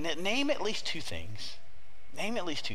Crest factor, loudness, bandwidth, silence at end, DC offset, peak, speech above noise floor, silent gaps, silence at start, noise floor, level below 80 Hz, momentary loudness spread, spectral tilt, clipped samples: 18 dB; -34 LUFS; 15.5 kHz; 0 s; 3%; -16 dBFS; 23 dB; none; 0 s; -58 dBFS; -62 dBFS; 13 LU; -3.5 dB/octave; under 0.1%